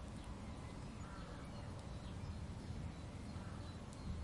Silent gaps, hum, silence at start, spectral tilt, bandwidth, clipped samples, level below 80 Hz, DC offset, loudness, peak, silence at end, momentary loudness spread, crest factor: none; none; 0 s; -6 dB/octave; 11.5 kHz; under 0.1%; -56 dBFS; under 0.1%; -50 LUFS; -36 dBFS; 0 s; 2 LU; 14 dB